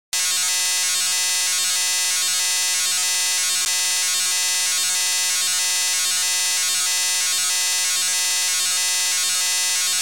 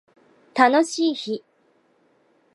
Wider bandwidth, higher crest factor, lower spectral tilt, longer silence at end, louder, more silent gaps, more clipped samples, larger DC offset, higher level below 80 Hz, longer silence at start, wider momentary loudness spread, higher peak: first, 17 kHz vs 11.5 kHz; second, 6 dB vs 24 dB; second, 4.5 dB/octave vs -3 dB/octave; second, 0 s vs 1.15 s; first, -17 LUFS vs -21 LUFS; neither; neither; first, 0.6% vs under 0.1%; first, -74 dBFS vs -80 dBFS; second, 0.1 s vs 0.55 s; second, 0 LU vs 14 LU; second, -14 dBFS vs 0 dBFS